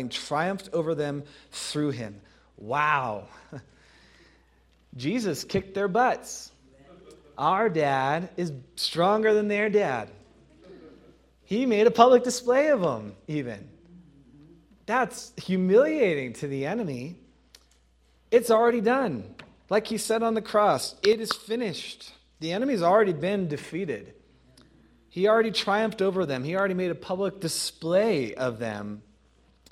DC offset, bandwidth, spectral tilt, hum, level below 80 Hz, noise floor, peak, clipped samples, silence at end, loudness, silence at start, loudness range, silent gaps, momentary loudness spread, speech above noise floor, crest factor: under 0.1%; 15.5 kHz; -5 dB/octave; none; -62 dBFS; -62 dBFS; -2 dBFS; under 0.1%; 0.7 s; -25 LUFS; 0 s; 6 LU; none; 16 LU; 37 dB; 26 dB